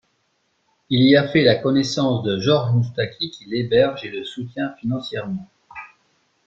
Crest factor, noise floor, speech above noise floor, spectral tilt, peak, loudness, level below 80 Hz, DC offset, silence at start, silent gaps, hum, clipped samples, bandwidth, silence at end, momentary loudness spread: 18 dB; -68 dBFS; 48 dB; -6.5 dB/octave; -2 dBFS; -20 LUFS; -56 dBFS; under 0.1%; 0.9 s; none; none; under 0.1%; 7.8 kHz; 0.6 s; 16 LU